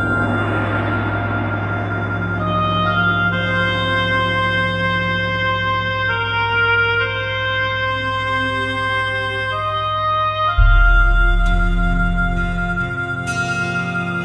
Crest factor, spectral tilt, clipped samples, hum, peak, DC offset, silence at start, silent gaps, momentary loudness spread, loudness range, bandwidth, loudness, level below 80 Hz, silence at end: 16 dB; -6 dB/octave; under 0.1%; none; -2 dBFS; under 0.1%; 0 s; none; 6 LU; 2 LU; 10 kHz; -18 LUFS; -22 dBFS; 0 s